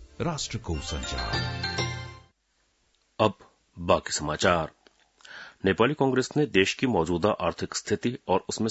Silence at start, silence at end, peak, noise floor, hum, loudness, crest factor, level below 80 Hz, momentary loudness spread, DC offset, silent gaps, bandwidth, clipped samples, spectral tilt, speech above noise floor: 0 s; 0 s; -6 dBFS; -71 dBFS; none; -27 LUFS; 22 dB; -48 dBFS; 9 LU; under 0.1%; none; 8 kHz; under 0.1%; -4.5 dB/octave; 45 dB